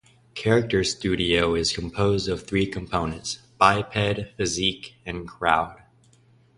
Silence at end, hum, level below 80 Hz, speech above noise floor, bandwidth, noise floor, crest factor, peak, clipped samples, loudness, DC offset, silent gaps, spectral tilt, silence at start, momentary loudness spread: 0.8 s; none; -44 dBFS; 34 dB; 11.5 kHz; -58 dBFS; 22 dB; -2 dBFS; under 0.1%; -24 LUFS; under 0.1%; none; -4.5 dB/octave; 0.35 s; 13 LU